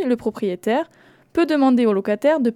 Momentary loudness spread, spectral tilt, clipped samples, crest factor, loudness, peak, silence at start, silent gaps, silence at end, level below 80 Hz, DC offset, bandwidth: 8 LU; -6.5 dB/octave; under 0.1%; 14 dB; -20 LUFS; -6 dBFS; 0 s; none; 0 s; -60 dBFS; under 0.1%; 13 kHz